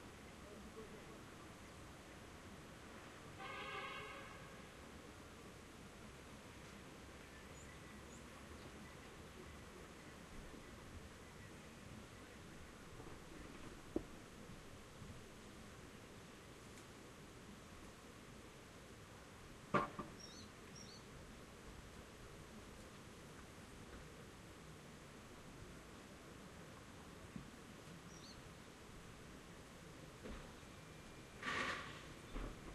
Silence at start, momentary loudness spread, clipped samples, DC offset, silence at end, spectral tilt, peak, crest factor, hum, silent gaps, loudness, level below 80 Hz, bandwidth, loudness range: 0 s; 9 LU; under 0.1%; under 0.1%; 0 s; -4 dB/octave; -22 dBFS; 32 dB; none; none; -54 LUFS; -64 dBFS; 13 kHz; 8 LU